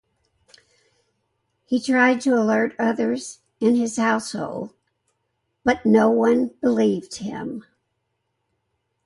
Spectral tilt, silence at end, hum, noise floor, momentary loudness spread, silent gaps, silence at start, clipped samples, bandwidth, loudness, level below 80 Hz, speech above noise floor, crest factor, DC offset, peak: -5 dB/octave; 1.45 s; none; -75 dBFS; 14 LU; none; 1.7 s; under 0.1%; 11.5 kHz; -21 LUFS; -62 dBFS; 55 dB; 18 dB; under 0.1%; -6 dBFS